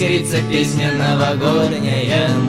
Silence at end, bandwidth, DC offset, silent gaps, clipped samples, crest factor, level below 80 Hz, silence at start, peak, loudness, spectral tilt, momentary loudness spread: 0 s; 15 kHz; 0.2%; none; under 0.1%; 14 dB; -46 dBFS; 0 s; -2 dBFS; -16 LUFS; -5.5 dB/octave; 2 LU